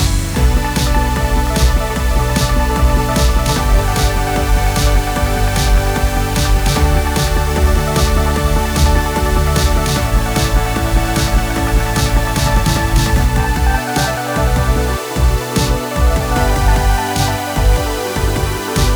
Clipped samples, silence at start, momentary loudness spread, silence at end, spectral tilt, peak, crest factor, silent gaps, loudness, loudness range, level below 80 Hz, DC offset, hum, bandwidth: under 0.1%; 0 s; 2 LU; 0 s; -4.5 dB/octave; -4 dBFS; 10 dB; none; -15 LUFS; 1 LU; -16 dBFS; under 0.1%; none; over 20 kHz